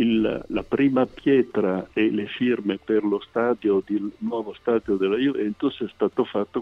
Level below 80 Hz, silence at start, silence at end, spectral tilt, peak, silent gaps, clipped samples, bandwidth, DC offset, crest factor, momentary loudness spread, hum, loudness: -54 dBFS; 0 s; 0 s; -8 dB/octave; -8 dBFS; none; under 0.1%; 5.8 kHz; under 0.1%; 16 dB; 7 LU; none; -24 LUFS